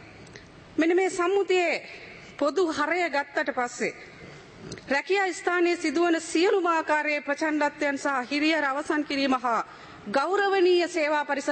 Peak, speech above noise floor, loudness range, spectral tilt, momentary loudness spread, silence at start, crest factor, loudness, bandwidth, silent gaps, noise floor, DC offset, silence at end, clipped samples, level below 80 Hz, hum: -12 dBFS; 22 dB; 3 LU; -3 dB/octave; 18 LU; 0 s; 14 dB; -25 LUFS; 8.8 kHz; none; -47 dBFS; under 0.1%; 0 s; under 0.1%; -66 dBFS; none